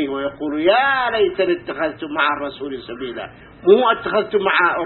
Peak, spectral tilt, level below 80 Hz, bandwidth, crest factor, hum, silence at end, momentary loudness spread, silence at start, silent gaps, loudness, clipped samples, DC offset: -2 dBFS; -9.5 dB/octave; -52 dBFS; 4.3 kHz; 18 dB; none; 0 s; 15 LU; 0 s; none; -18 LUFS; under 0.1%; under 0.1%